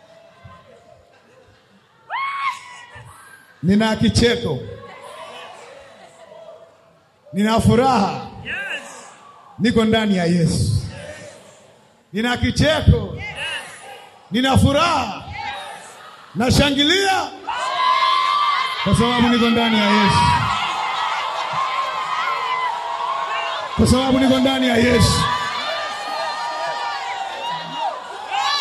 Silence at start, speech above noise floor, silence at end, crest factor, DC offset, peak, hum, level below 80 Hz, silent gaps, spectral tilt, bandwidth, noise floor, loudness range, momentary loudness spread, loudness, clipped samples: 0.45 s; 38 dB; 0 s; 20 dB; under 0.1%; 0 dBFS; none; -38 dBFS; none; -5 dB/octave; 13.5 kHz; -54 dBFS; 7 LU; 19 LU; -19 LUFS; under 0.1%